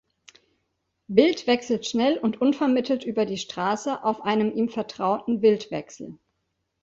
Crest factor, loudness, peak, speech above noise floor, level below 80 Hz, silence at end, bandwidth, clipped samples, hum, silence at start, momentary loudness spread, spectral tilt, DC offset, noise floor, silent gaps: 22 dB; -24 LUFS; -4 dBFS; 53 dB; -66 dBFS; 0.65 s; 7.8 kHz; under 0.1%; none; 1.1 s; 7 LU; -5 dB/octave; under 0.1%; -77 dBFS; none